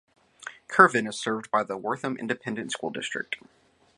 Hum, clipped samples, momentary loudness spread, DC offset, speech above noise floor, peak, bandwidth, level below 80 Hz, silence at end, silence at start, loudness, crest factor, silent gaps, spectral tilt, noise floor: none; under 0.1%; 18 LU; under 0.1%; 19 dB; -2 dBFS; 11.5 kHz; -72 dBFS; 0.6 s; 0.45 s; -26 LUFS; 26 dB; none; -4 dB/octave; -45 dBFS